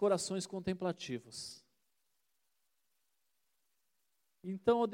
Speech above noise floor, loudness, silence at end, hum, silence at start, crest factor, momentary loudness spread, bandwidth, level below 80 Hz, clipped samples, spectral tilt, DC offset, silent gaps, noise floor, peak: 48 dB; -38 LUFS; 0 s; none; 0 s; 22 dB; 15 LU; 16.5 kHz; -72 dBFS; under 0.1%; -5 dB/octave; under 0.1%; none; -84 dBFS; -18 dBFS